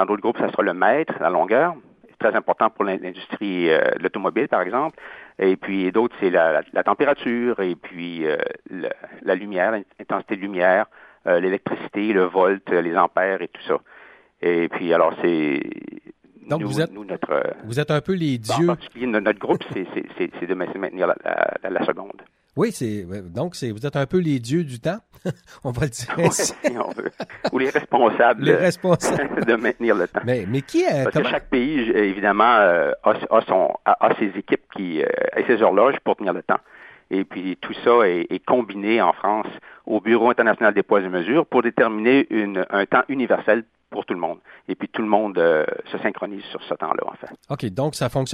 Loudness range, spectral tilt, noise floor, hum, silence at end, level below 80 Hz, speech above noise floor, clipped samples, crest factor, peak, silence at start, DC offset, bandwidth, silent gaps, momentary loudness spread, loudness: 6 LU; -5.5 dB/octave; -48 dBFS; none; 0 s; -58 dBFS; 28 dB; under 0.1%; 20 dB; 0 dBFS; 0 s; under 0.1%; 14.5 kHz; none; 12 LU; -21 LUFS